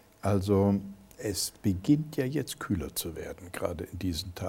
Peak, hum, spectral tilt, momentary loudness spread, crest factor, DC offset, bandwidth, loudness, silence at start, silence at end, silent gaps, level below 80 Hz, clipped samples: -12 dBFS; none; -5.5 dB/octave; 12 LU; 18 dB; under 0.1%; 17 kHz; -31 LUFS; 0.25 s; 0 s; none; -52 dBFS; under 0.1%